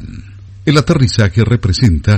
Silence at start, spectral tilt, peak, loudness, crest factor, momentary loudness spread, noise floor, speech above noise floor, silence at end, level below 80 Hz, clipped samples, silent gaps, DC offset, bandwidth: 0 s; -6.5 dB/octave; 0 dBFS; -12 LUFS; 12 dB; 13 LU; -32 dBFS; 22 dB; 0 s; -26 dBFS; 0.6%; none; under 0.1%; 9.4 kHz